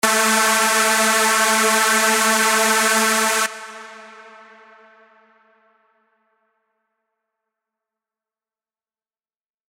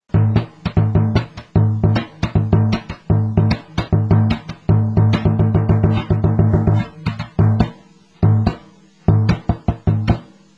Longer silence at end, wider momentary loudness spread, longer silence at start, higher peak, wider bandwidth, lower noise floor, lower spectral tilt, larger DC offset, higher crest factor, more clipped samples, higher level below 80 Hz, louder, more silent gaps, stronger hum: first, 5.45 s vs 0.35 s; about the same, 7 LU vs 7 LU; about the same, 0.05 s vs 0.15 s; about the same, -4 dBFS vs -2 dBFS; first, 17.5 kHz vs 6.4 kHz; first, under -90 dBFS vs -46 dBFS; second, -0.5 dB/octave vs -9 dB/octave; neither; about the same, 18 dB vs 14 dB; neither; second, -70 dBFS vs -30 dBFS; about the same, -15 LUFS vs -17 LUFS; neither; neither